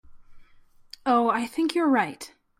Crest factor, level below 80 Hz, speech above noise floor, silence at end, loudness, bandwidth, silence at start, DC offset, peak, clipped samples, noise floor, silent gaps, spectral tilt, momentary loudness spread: 18 dB; -60 dBFS; 31 dB; 0.35 s; -24 LUFS; 15.5 kHz; 0.1 s; under 0.1%; -10 dBFS; under 0.1%; -54 dBFS; none; -4.5 dB/octave; 10 LU